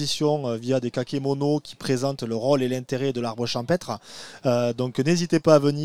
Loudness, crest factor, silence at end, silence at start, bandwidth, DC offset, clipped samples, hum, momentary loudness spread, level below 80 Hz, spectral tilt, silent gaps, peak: -24 LUFS; 22 dB; 0 s; 0 s; 15.5 kHz; 0.3%; under 0.1%; none; 7 LU; -60 dBFS; -6 dB/octave; none; -2 dBFS